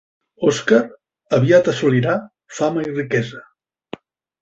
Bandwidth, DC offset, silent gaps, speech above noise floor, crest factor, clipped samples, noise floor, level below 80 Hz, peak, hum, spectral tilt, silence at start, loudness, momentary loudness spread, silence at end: 8 kHz; under 0.1%; none; 21 dB; 16 dB; under 0.1%; -38 dBFS; -58 dBFS; -2 dBFS; none; -6 dB/octave; 0.4 s; -18 LUFS; 23 LU; 1 s